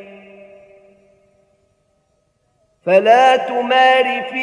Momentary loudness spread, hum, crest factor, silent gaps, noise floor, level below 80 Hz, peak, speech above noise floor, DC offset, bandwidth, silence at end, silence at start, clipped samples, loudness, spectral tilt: 7 LU; none; 16 dB; none; -64 dBFS; -70 dBFS; 0 dBFS; 51 dB; under 0.1%; 10.5 kHz; 0 s; 0 s; under 0.1%; -13 LUFS; -4 dB/octave